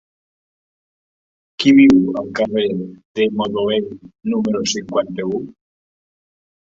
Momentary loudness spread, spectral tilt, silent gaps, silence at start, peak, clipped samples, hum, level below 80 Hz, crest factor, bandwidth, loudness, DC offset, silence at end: 16 LU; -5 dB/octave; 3.05-3.15 s; 1.6 s; -2 dBFS; under 0.1%; none; -54 dBFS; 18 dB; 7.6 kHz; -17 LUFS; under 0.1%; 1.15 s